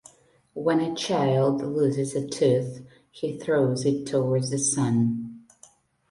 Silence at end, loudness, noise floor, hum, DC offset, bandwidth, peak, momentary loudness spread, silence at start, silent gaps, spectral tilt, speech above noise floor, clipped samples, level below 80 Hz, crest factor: 0.7 s; -25 LUFS; -57 dBFS; none; under 0.1%; 11.5 kHz; -10 dBFS; 11 LU; 0.55 s; none; -5.5 dB/octave; 33 dB; under 0.1%; -64 dBFS; 16 dB